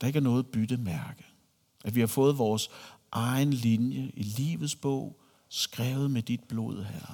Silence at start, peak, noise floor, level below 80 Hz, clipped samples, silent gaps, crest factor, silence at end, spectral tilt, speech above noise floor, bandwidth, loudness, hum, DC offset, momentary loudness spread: 0 s; -12 dBFS; -66 dBFS; -68 dBFS; under 0.1%; none; 18 dB; 0 s; -6 dB/octave; 37 dB; 19 kHz; -30 LUFS; none; under 0.1%; 12 LU